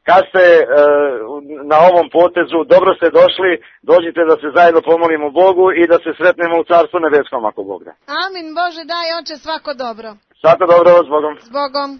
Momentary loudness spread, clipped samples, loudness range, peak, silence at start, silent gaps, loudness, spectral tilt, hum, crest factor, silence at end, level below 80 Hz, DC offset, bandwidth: 14 LU; under 0.1%; 7 LU; 0 dBFS; 0.05 s; none; -12 LUFS; -6 dB/octave; none; 12 dB; 0.05 s; -58 dBFS; under 0.1%; 6.2 kHz